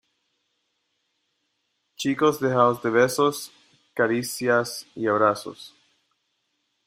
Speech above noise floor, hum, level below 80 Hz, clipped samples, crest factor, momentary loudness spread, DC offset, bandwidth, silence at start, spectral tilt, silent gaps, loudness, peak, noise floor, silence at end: 52 dB; none; -70 dBFS; under 0.1%; 20 dB; 15 LU; under 0.1%; 16 kHz; 2 s; -4.5 dB/octave; none; -23 LUFS; -6 dBFS; -75 dBFS; 1.2 s